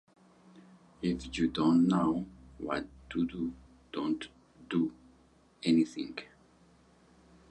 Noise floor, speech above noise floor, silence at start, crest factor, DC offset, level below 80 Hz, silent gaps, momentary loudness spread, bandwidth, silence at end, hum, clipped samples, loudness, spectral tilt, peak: -64 dBFS; 33 dB; 0.55 s; 18 dB; under 0.1%; -58 dBFS; none; 15 LU; 9.2 kHz; 1.25 s; none; under 0.1%; -32 LUFS; -6.5 dB/octave; -16 dBFS